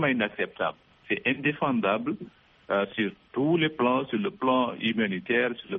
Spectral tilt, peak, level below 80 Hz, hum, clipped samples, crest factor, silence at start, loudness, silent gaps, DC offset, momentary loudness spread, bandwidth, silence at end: -3.5 dB/octave; -10 dBFS; -68 dBFS; none; under 0.1%; 16 dB; 0 s; -27 LUFS; none; under 0.1%; 7 LU; 4 kHz; 0 s